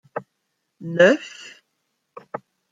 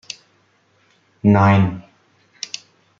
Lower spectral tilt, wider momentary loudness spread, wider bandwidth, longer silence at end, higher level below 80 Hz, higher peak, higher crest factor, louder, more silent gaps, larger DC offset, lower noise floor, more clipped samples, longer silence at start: second, -5.5 dB/octave vs -7 dB/octave; about the same, 23 LU vs 22 LU; about the same, 7.8 kHz vs 7.4 kHz; second, 0.35 s vs 1.2 s; second, -74 dBFS vs -54 dBFS; about the same, -2 dBFS vs -2 dBFS; about the same, 22 dB vs 18 dB; about the same, -18 LUFS vs -17 LUFS; neither; neither; first, -75 dBFS vs -60 dBFS; neither; second, 0.15 s vs 1.25 s